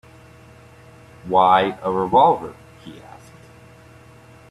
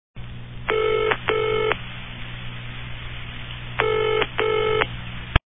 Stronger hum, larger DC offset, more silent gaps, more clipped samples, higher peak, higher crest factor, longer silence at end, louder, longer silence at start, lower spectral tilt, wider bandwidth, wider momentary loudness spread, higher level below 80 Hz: second, none vs 60 Hz at -40 dBFS; second, under 0.1% vs 0.3%; neither; neither; about the same, -2 dBFS vs 0 dBFS; about the same, 20 dB vs 24 dB; first, 1.55 s vs 0.1 s; first, -17 LUFS vs -24 LUFS; first, 1.25 s vs 0.15 s; second, -6.5 dB/octave vs -9.5 dB/octave; first, 12.5 kHz vs 3.9 kHz; first, 26 LU vs 14 LU; second, -56 dBFS vs -38 dBFS